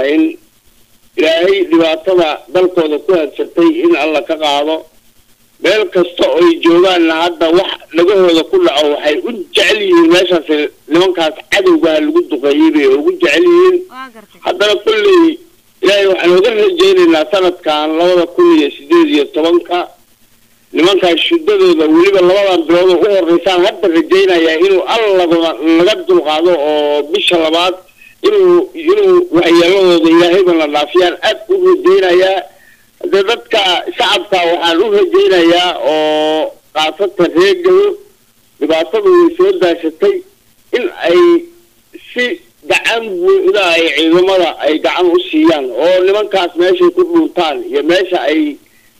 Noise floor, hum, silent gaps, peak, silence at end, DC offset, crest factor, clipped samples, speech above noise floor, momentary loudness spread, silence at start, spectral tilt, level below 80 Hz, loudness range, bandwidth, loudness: -50 dBFS; none; none; -2 dBFS; 0.45 s; 0.4%; 8 dB; under 0.1%; 40 dB; 7 LU; 0 s; -4 dB/octave; -50 dBFS; 3 LU; 14.5 kHz; -10 LUFS